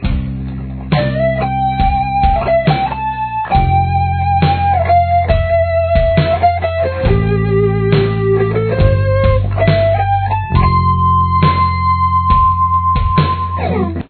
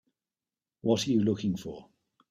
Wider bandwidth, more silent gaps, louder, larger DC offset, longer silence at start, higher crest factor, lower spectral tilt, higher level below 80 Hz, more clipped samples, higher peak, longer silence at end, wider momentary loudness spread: second, 4.5 kHz vs 14 kHz; neither; first, -13 LUFS vs -29 LUFS; neither; second, 0 s vs 0.85 s; second, 12 dB vs 18 dB; first, -11 dB/octave vs -6 dB/octave; first, -22 dBFS vs -66 dBFS; neither; first, 0 dBFS vs -14 dBFS; second, 0.05 s vs 0.45 s; second, 5 LU vs 16 LU